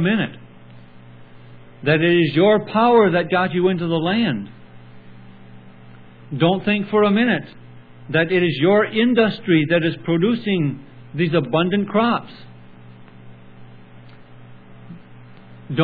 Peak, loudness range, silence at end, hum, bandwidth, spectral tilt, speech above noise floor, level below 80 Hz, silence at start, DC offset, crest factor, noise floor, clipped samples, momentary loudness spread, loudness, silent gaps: -2 dBFS; 6 LU; 0 s; none; 4.9 kHz; -10 dB/octave; 25 dB; -56 dBFS; 0 s; under 0.1%; 18 dB; -42 dBFS; under 0.1%; 10 LU; -18 LUFS; none